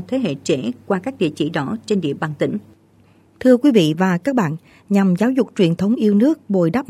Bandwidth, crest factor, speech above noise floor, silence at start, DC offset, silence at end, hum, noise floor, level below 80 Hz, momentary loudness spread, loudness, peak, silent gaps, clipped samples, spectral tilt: 14 kHz; 16 dB; 35 dB; 0 s; under 0.1%; 0.05 s; none; -52 dBFS; -58 dBFS; 8 LU; -18 LUFS; -2 dBFS; none; under 0.1%; -7 dB/octave